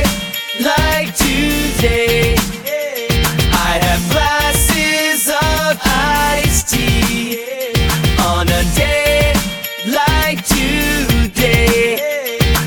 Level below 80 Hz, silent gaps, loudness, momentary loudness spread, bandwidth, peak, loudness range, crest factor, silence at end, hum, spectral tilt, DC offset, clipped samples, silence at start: -22 dBFS; none; -14 LUFS; 6 LU; over 20 kHz; 0 dBFS; 1 LU; 14 dB; 0 s; none; -3.5 dB/octave; under 0.1%; under 0.1%; 0 s